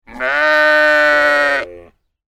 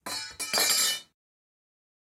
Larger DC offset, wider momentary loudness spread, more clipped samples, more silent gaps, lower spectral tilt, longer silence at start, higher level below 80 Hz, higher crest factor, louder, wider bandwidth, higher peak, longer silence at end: neither; second, 9 LU vs 12 LU; neither; neither; first, -2 dB/octave vs 1.5 dB/octave; about the same, 0.1 s vs 0.05 s; first, -48 dBFS vs -72 dBFS; second, 14 dB vs 22 dB; first, -12 LUFS vs -25 LUFS; second, 15 kHz vs 17 kHz; first, 0 dBFS vs -10 dBFS; second, 0.5 s vs 1.1 s